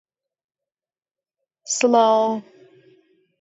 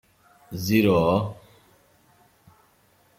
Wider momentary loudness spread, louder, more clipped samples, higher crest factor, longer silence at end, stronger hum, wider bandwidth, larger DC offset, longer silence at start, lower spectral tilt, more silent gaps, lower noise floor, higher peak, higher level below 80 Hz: second, 11 LU vs 15 LU; first, -19 LUFS vs -22 LUFS; neither; about the same, 20 dB vs 20 dB; second, 1 s vs 1.85 s; neither; second, 8 kHz vs 16 kHz; neither; first, 1.65 s vs 0.5 s; second, -3 dB/octave vs -6.5 dB/octave; neither; first, under -90 dBFS vs -61 dBFS; about the same, -4 dBFS vs -6 dBFS; second, -80 dBFS vs -56 dBFS